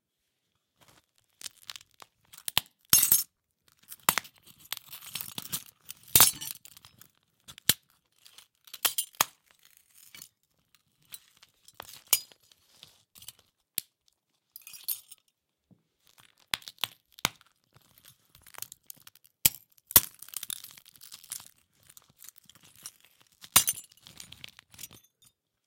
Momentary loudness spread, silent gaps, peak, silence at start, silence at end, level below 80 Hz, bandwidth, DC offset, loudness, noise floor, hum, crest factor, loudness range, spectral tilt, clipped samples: 27 LU; none; -2 dBFS; 1.45 s; 0.8 s; -64 dBFS; 17 kHz; under 0.1%; -27 LUFS; -81 dBFS; none; 32 dB; 12 LU; 0 dB/octave; under 0.1%